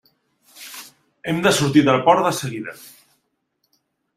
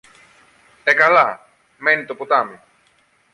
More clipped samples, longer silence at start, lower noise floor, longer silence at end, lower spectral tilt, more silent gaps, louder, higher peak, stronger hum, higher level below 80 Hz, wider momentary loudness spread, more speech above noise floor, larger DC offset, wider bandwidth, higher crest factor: neither; second, 0.55 s vs 0.85 s; first, -71 dBFS vs -59 dBFS; first, 1.4 s vs 0.8 s; about the same, -4.5 dB/octave vs -4 dB/octave; neither; about the same, -17 LUFS vs -16 LUFS; about the same, -2 dBFS vs -2 dBFS; neither; first, -58 dBFS vs -70 dBFS; first, 22 LU vs 12 LU; first, 53 dB vs 43 dB; neither; first, 16 kHz vs 11.5 kHz; about the same, 20 dB vs 18 dB